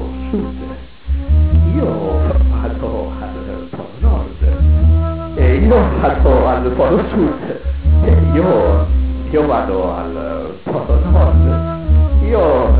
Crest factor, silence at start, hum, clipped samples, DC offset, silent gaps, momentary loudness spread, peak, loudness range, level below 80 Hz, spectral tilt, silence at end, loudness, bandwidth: 12 dB; 0 s; none; under 0.1%; 2%; none; 11 LU; 0 dBFS; 4 LU; -16 dBFS; -12.5 dB/octave; 0 s; -15 LUFS; 4 kHz